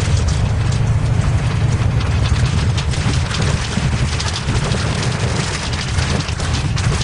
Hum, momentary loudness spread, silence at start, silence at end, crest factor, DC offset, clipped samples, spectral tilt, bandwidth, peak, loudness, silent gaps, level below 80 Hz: none; 3 LU; 0 s; 0 s; 12 dB; under 0.1%; under 0.1%; -5 dB/octave; 11 kHz; -4 dBFS; -18 LUFS; none; -24 dBFS